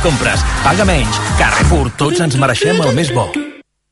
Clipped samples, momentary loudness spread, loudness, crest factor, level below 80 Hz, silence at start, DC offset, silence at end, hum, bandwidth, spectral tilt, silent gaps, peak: under 0.1%; 5 LU; -13 LUFS; 12 dB; -22 dBFS; 0 s; under 0.1%; 0.3 s; none; 11.5 kHz; -4.5 dB/octave; none; 0 dBFS